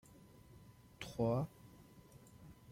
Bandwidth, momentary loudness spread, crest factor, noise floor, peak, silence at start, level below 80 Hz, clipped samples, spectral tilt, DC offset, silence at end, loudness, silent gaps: 16.5 kHz; 25 LU; 22 dB; -62 dBFS; -24 dBFS; 0.1 s; -68 dBFS; under 0.1%; -7 dB/octave; under 0.1%; 0 s; -41 LUFS; none